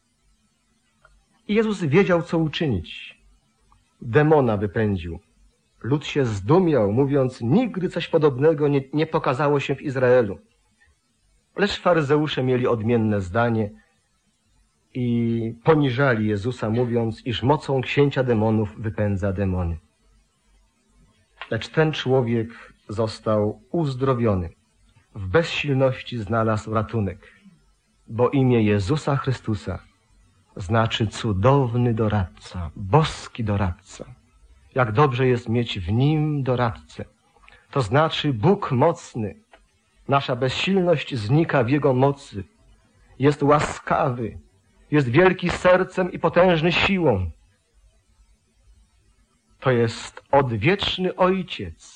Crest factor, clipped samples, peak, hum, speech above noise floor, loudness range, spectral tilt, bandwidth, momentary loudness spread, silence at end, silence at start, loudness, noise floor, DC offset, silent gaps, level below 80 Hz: 18 dB; under 0.1%; -4 dBFS; none; 46 dB; 4 LU; -7 dB/octave; 10 kHz; 13 LU; 0.2 s; 1.5 s; -22 LUFS; -67 dBFS; under 0.1%; none; -44 dBFS